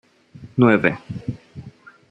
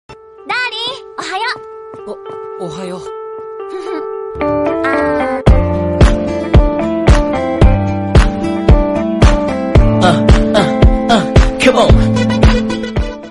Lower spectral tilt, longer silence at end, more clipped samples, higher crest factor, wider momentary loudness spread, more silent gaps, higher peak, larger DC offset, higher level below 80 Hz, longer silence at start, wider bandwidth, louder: first, -9 dB/octave vs -6.5 dB/octave; first, 0.4 s vs 0 s; neither; first, 20 dB vs 12 dB; first, 24 LU vs 15 LU; neither; about the same, -2 dBFS vs 0 dBFS; neither; second, -54 dBFS vs -16 dBFS; first, 0.4 s vs 0.1 s; second, 7.8 kHz vs 11.5 kHz; second, -19 LUFS vs -13 LUFS